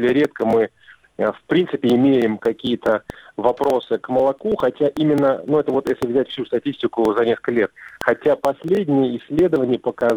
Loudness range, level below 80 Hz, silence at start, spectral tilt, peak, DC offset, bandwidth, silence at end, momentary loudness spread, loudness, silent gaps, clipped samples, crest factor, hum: 1 LU; -54 dBFS; 0 s; -7 dB/octave; 0 dBFS; under 0.1%; 19 kHz; 0 s; 6 LU; -19 LUFS; none; under 0.1%; 18 dB; none